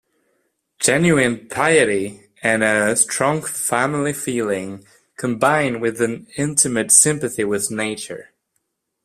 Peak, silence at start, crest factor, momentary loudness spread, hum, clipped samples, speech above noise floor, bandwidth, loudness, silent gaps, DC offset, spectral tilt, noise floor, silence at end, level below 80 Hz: 0 dBFS; 0.8 s; 20 dB; 12 LU; none; under 0.1%; 54 dB; 15.5 kHz; -18 LUFS; none; under 0.1%; -3.5 dB/octave; -72 dBFS; 0.8 s; -56 dBFS